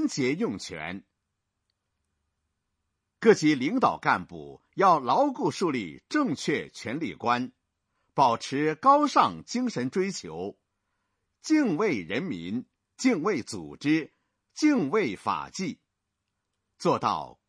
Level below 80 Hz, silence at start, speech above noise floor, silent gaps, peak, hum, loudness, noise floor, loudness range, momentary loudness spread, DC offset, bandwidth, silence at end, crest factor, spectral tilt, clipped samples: -68 dBFS; 0 s; 56 dB; none; -6 dBFS; none; -26 LUFS; -82 dBFS; 5 LU; 15 LU; under 0.1%; 10.5 kHz; 0.2 s; 22 dB; -5 dB/octave; under 0.1%